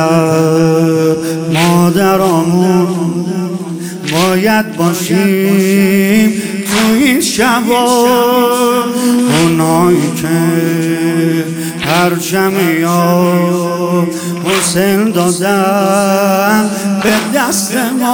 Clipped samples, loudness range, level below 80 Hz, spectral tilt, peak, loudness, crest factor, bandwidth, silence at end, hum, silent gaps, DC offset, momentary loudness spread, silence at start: under 0.1%; 2 LU; -48 dBFS; -5 dB/octave; 0 dBFS; -11 LUFS; 10 dB; 18 kHz; 0 s; none; none; under 0.1%; 5 LU; 0 s